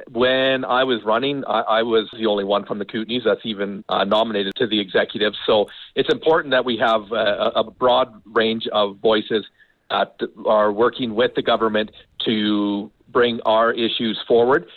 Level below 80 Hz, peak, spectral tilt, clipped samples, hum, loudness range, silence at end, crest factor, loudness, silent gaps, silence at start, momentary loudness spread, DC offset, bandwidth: -58 dBFS; -8 dBFS; -6.5 dB/octave; under 0.1%; none; 2 LU; 0.15 s; 12 dB; -20 LUFS; none; 0 s; 7 LU; under 0.1%; 5.8 kHz